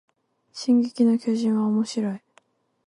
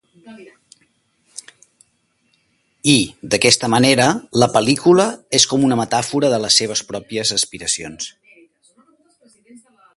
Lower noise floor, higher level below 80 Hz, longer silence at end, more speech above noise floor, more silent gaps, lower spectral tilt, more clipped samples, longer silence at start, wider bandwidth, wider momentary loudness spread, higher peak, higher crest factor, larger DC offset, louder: about the same, -62 dBFS vs -65 dBFS; second, -74 dBFS vs -54 dBFS; second, 0.7 s vs 1.85 s; second, 40 dB vs 48 dB; neither; first, -6.5 dB/octave vs -3 dB/octave; neither; first, 0.55 s vs 0.25 s; about the same, 11 kHz vs 12 kHz; second, 11 LU vs 16 LU; second, -10 dBFS vs 0 dBFS; second, 14 dB vs 20 dB; neither; second, -23 LUFS vs -16 LUFS